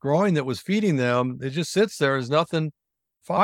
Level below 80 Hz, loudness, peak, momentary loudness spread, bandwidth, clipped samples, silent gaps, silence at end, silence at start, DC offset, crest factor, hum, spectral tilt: -66 dBFS; -24 LUFS; -6 dBFS; 6 LU; 16 kHz; under 0.1%; none; 0 s; 0.05 s; under 0.1%; 18 dB; none; -6 dB/octave